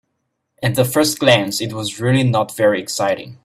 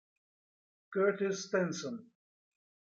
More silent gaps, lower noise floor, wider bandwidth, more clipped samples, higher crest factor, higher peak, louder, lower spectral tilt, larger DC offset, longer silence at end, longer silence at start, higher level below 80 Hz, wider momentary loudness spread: neither; second, -72 dBFS vs under -90 dBFS; first, 16 kHz vs 7.8 kHz; neither; about the same, 18 dB vs 18 dB; first, 0 dBFS vs -18 dBFS; first, -17 LUFS vs -34 LUFS; about the same, -4.5 dB/octave vs -5 dB/octave; neither; second, 0.1 s vs 0.85 s; second, 0.6 s vs 0.9 s; first, -54 dBFS vs -84 dBFS; second, 8 LU vs 11 LU